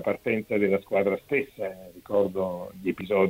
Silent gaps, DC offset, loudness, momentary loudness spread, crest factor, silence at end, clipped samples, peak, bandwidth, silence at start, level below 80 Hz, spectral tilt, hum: none; under 0.1%; -27 LUFS; 10 LU; 18 dB; 0 s; under 0.1%; -8 dBFS; 16 kHz; 0 s; -62 dBFS; -7.5 dB/octave; none